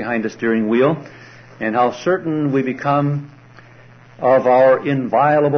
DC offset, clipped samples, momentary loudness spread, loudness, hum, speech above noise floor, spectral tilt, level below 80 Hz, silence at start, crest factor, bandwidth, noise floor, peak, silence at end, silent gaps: under 0.1%; under 0.1%; 9 LU; -17 LUFS; none; 28 dB; -8 dB/octave; -60 dBFS; 0 s; 14 dB; 6.4 kHz; -44 dBFS; -2 dBFS; 0 s; none